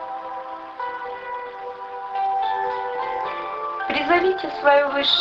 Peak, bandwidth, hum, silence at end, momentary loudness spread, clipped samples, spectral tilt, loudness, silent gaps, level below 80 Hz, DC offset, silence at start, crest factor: -4 dBFS; 7.4 kHz; none; 0 s; 15 LU; under 0.1%; -4 dB/octave; -23 LUFS; none; -60 dBFS; under 0.1%; 0 s; 18 dB